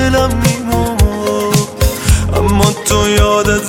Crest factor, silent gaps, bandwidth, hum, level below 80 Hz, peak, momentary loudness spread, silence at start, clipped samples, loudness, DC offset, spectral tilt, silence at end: 12 dB; none; 17 kHz; none; -18 dBFS; 0 dBFS; 4 LU; 0 s; under 0.1%; -13 LUFS; under 0.1%; -5 dB/octave; 0 s